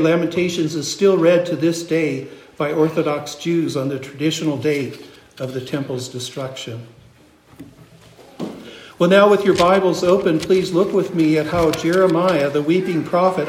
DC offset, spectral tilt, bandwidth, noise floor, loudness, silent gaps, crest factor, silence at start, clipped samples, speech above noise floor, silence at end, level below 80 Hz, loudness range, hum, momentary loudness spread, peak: under 0.1%; -5.5 dB/octave; 16 kHz; -49 dBFS; -18 LUFS; none; 18 dB; 0 s; under 0.1%; 32 dB; 0 s; -52 dBFS; 14 LU; none; 16 LU; -2 dBFS